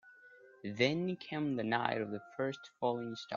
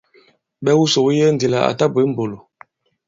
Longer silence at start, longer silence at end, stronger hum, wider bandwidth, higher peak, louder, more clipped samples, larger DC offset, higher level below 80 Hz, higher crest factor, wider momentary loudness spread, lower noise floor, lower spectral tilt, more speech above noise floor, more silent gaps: second, 0.05 s vs 0.6 s; second, 0 s vs 0.7 s; neither; about the same, 7.4 kHz vs 7.8 kHz; second, -14 dBFS vs 0 dBFS; second, -36 LUFS vs -17 LUFS; neither; neither; second, -78 dBFS vs -58 dBFS; first, 24 dB vs 18 dB; about the same, 8 LU vs 10 LU; first, -60 dBFS vs -55 dBFS; second, -4 dB/octave vs -5.5 dB/octave; second, 24 dB vs 39 dB; neither